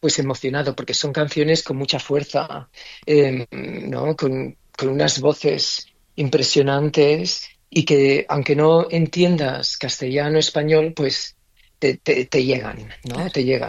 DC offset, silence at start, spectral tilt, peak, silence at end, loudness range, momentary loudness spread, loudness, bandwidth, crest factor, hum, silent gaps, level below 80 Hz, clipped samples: under 0.1%; 0.05 s; -4.5 dB/octave; -4 dBFS; 0 s; 4 LU; 11 LU; -19 LUFS; 8.8 kHz; 16 dB; none; none; -54 dBFS; under 0.1%